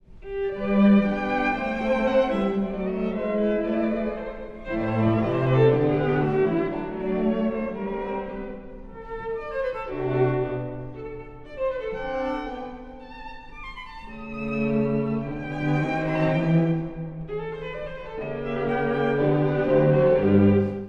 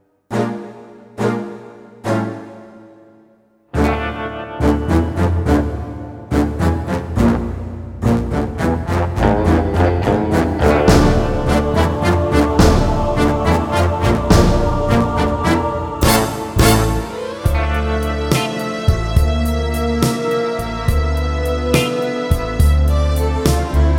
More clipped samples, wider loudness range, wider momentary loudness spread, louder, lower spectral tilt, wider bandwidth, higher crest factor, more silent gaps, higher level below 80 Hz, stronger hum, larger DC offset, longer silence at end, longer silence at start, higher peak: neither; about the same, 7 LU vs 6 LU; first, 18 LU vs 11 LU; second, -24 LUFS vs -17 LUFS; first, -9.5 dB/octave vs -6 dB/octave; second, 6.8 kHz vs 18 kHz; about the same, 18 dB vs 16 dB; neither; second, -44 dBFS vs -22 dBFS; neither; neither; about the same, 0 s vs 0 s; second, 0.1 s vs 0.3 s; second, -6 dBFS vs 0 dBFS